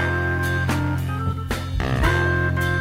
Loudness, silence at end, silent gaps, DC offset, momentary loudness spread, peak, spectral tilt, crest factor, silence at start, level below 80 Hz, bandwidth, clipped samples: -22 LUFS; 0 s; none; under 0.1%; 6 LU; -6 dBFS; -6 dB/octave; 14 dB; 0 s; -32 dBFS; 16 kHz; under 0.1%